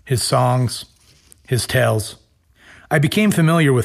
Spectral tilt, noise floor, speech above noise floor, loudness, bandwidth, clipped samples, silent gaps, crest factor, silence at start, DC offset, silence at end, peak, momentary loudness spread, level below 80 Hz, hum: -5.5 dB/octave; -51 dBFS; 35 dB; -17 LUFS; 15.5 kHz; under 0.1%; none; 14 dB; 0.05 s; under 0.1%; 0 s; -4 dBFS; 9 LU; -48 dBFS; none